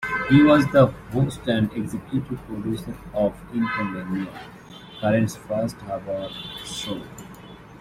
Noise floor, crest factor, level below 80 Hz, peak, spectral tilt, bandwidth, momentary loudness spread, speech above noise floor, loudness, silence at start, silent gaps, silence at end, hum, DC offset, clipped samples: -43 dBFS; 20 dB; -48 dBFS; -2 dBFS; -6.5 dB/octave; 15.5 kHz; 24 LU; 20 dB; -23 LUFS; 0 s; none; 0 s; none; under 0.1%; under 0.1%